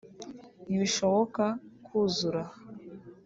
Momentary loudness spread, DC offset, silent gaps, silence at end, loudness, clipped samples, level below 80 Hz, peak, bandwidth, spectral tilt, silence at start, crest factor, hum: 20 LU; under 0.1%; none; 0.15 s; -29 LUFS; under 0.1%; -70 dBFS; -14 dBFS; 8 kHz; -4.5 dB/octave; 0.05 s; 18 dB; none